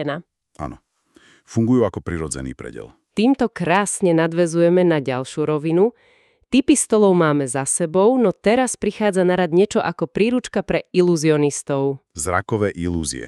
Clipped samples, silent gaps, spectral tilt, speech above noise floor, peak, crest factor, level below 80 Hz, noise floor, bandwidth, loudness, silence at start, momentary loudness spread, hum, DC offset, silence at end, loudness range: under 0.1%; none; -5.5 dB/octave; 36 dB; -4 dBFS; 16 dB; -48 dBFS; -54 dBFS; 13 kHz; -19 LUFS; 0 s; 12 LU; none; under 0.1%; 0 s; 4 LU